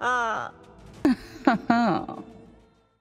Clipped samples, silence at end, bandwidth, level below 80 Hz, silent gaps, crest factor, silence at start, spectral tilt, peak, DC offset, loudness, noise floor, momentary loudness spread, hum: under 0.1%; 0.65 s; 11 kHz; -56 dBFS; none; 20 dB; 0 s; -6 dB/octave; -6 dBFS; under 0.1%; -25 LUFS; -57 dBFS; 16 LU; none